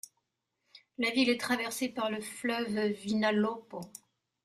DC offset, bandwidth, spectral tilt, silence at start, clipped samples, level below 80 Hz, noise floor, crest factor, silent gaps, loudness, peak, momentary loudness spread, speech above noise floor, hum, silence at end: under 0.1%; 15 kHz; -4 dB/octave; 0.75 s; under 0.1%; -74 dBFS; -82 dBFS; 18 dB; none; -31 LUFS; -14 dBFS; 18 LU; 50 dB; none; 0.5 s